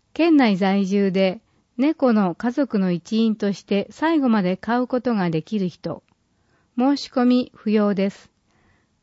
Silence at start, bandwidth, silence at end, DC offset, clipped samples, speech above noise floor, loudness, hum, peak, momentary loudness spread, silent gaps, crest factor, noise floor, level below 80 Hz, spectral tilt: 0.2 s; 8 kHz; 0.9 s; under 0.1%; under 0.1%; 44 dB; -21 LUFS; none; -8 dBFS; 8 LU; none; 14 dB; -64 dBFS; -64 dBFS; -7 dB/octave